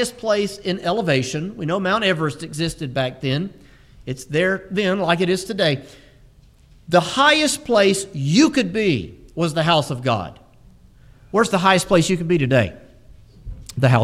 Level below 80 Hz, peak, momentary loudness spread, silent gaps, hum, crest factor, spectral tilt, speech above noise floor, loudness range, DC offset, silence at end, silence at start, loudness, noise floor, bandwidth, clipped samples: -46 dBFS; -2 dBFS; 10 LU; none; none; 18 dB; -5 dB/octave; 31 dB; 5 LU; under 0.1%; 0 s; 0 s; -19 LUFS; -50 dBFS; 15 kHz; under 0.1%